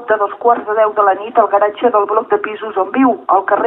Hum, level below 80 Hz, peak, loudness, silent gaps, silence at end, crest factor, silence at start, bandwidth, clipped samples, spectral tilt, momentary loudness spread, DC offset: none; -64 dBFS; 0 dBFS; -14 LUFS; none; 0 s; 14 dB; 0 s; 3.9 kHz; under 0.1%; -8.5 dB/octave; 5 LU; under 0.1%